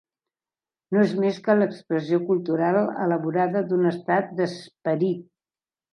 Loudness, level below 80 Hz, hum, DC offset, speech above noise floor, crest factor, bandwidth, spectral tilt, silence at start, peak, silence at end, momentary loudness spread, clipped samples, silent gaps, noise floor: -24 LUFS; -76 dBFS; none; under 0.1%; over 67 dB; 18 dB; 10.5 kHz; -8 dB/octave; 0.9 s; -6 dBFS; 0.7 s; 6 LU; under 0.1%; none; under -90 dBFS